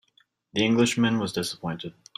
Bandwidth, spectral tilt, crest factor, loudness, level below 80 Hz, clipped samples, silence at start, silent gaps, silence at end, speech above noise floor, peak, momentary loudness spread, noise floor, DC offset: 14.5 kHz; -4.5 dB/octave; 18 dB; -25 LUFS; -62 dBFS; under 0.1%; 0.55 s; none; 0.25 s; 40 dB; -8 dBFS; 12 LU; -66 dBFS; under 0.1%